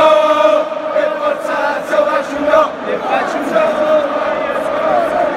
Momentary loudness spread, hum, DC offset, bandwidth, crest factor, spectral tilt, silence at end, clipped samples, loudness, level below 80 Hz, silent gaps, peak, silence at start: 6 LU; none; under 0.1%; 13 kHz; 14 dB; -4 dB/octave; 0 s; under 0.1%; -14 LUFS; -52 dBFS; none; 0 dBFS; 0 s